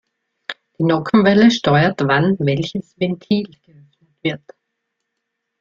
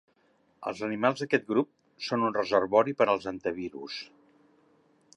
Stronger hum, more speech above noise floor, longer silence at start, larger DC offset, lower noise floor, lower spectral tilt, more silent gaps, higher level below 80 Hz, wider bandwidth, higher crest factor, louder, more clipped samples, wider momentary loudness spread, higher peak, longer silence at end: neither; first, 61 dB vs 40 dB; about the same, 0.5 s vs 0.6 s; neither; first, -76 dBFS vs -68 dBFS; about the same, -6.5 dB/octave vs -5.5 dB/octave; neither; first, -56 dBFS vs -70 dBFS; second, 7.4 kHz vs 11 kHz; about the same, 16 dB vs 20 dB; first, -17 LUFS vs -29 LUFS; neither; first, 19 LU vs 15 LU; first, -2 dBFS vs -10 dBFS; about the same, 1.25 s vs 1.15 s